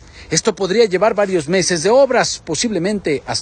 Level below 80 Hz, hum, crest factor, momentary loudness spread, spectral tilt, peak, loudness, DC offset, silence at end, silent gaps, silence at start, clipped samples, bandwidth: -48 dBFS; none; 16 dB; 7 LU; -3.5 dB/octave; 0 dBFS; -16 LUFS; under 0.1%; 0 s; none; 0.15 s; under 0.1%; 11 kHz